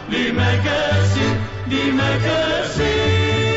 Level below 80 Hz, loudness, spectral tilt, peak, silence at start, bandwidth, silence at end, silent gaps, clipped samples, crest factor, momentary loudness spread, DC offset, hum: -36 dBFS; -18 LUFS; -5.5 dB/octave; -8 dBFS; 0 s; 8 kHz; 0 s; none; under 0.1%; 10 dB; 3 LU; under 0.1%; none